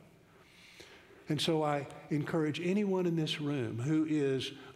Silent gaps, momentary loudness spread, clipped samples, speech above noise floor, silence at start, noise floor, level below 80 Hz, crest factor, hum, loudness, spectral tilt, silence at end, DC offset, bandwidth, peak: none; 22 LU; under 0.1%; 28 dB; 0.6 s; -61 dBFS; -74 dBFS; 16 dB; none; -33 LUFS; -6 dB/octave; 0 s; under 0.1%; 13.5 kHz; -18 dBFS